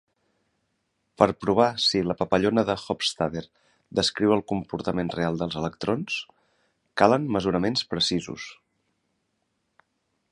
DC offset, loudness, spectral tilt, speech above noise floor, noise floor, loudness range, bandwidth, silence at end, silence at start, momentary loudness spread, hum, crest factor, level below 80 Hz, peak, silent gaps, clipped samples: under 0.1%; -25 LUFS; -5 dB/octave; 51 dB; -75 dBFS; 3 LU; 11.5 kHz; 1.8 s; 1.2 s; 10 LU; none; 26 dB; -54 dBFS; -2 dBFS; none; under 0.1%